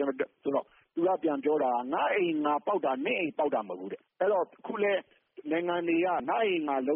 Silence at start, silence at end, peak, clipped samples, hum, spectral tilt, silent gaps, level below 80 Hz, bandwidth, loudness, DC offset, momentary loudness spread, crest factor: 0 s; 0 s; -16 dBFS; under 0.1%; none; -0.5 dB/octave; none; -78 dBFS; 3.7 kHz; -30 LUFS; under 0.1%; 6 LU; 14 dB